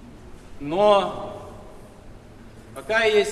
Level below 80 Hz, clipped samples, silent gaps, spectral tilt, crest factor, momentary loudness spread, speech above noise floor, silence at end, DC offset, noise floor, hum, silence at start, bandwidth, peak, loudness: -48 dBFS; under 0.1%; none; -4 dB/octave; 20 dB; 23 LU; 24 dB; 0 s; under 0.1%; -44 dBFS; none; 0 s; 13 kHz; -4 dBFS; -21 LUFS